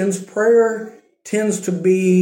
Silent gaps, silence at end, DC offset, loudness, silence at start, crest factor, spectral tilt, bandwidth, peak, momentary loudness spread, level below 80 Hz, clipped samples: none; 0 s; under 0.1%; -17 LUFS; 0 s; 12 dB; -6.5 dB/octave; 17 kHz; -6 dBFS; 11 LU; -72 dBFS; under 0.1%